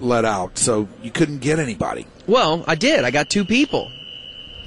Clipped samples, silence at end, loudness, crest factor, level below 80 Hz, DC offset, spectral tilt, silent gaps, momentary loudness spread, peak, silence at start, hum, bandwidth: under 0.1%; 0 s; -19 LUFS; 16 dB; -46 dBFS; under 0.1%; -4 dB/octave; none; 15 LU; -4 dBFS; 0 s; none; 11.5 kHz